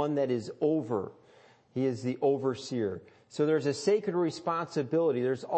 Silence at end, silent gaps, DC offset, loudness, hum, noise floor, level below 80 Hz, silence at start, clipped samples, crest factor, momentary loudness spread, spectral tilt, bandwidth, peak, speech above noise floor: 0 s; none; under 0.1%; -30 LUFS; none; -60 dBFS; -78 dBFS; 0 s; under 0.1%; 14 dB; 7 LU; -6.5 dB/octave; 8.8 kHz; -16 dBFS; 30 dB